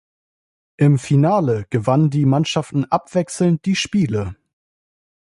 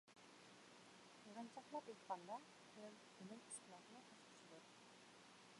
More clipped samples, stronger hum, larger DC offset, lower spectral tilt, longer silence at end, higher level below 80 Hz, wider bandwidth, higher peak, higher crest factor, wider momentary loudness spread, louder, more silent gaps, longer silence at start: neither; neither; neither; first, -6.5 dB/octave vs -3 dB/octave; first, 1 s vs 0 s; first, -48 dBFS vs under -90 dBFS; about the same, 11.5 kHz vs 11.5 kHz; first, -2 dBFS vs -36 dBFS; second, 16 dB vs 24 dB; second, 6 LU vs 11 LU; first, -18 LUFS vs -59 LUFS; neither; first, 0.8 s vs 0.05 s